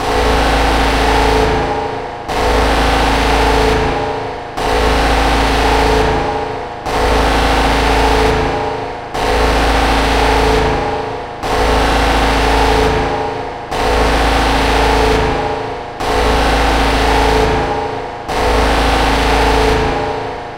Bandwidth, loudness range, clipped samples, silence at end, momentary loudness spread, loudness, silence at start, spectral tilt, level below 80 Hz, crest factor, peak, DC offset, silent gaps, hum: 16 kHz; 1 LU; under 0.1%; 0 s; 8 LU; -14 LUFS; 0 s; -4.5 dB/octave; -20 dBFS; 14 dB; 0 dBFS; under 0.1%; none; none